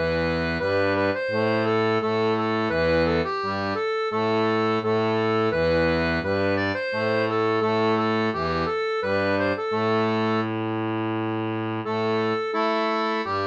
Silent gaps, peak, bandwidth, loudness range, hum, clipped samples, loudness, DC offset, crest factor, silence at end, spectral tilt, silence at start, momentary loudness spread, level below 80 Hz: none; -10 dBFS; 7.8 kHz; 2 LU; none; under 0.1%; -23 LUFS; under 0.1%; 14 dB; 0 s; -7 dB/octave; 0 s; 4 LU; -48 dBFS